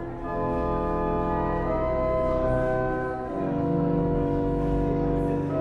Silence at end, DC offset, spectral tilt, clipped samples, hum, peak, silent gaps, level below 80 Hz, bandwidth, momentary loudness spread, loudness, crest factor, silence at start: 0 s; under 0.1%; -10 dB/octave; under 0.1%; none; -14 dBFS; none; -34 dBFS; 9.2 kHz; 4 LU; -26 LUFS; 12 dB; 0 s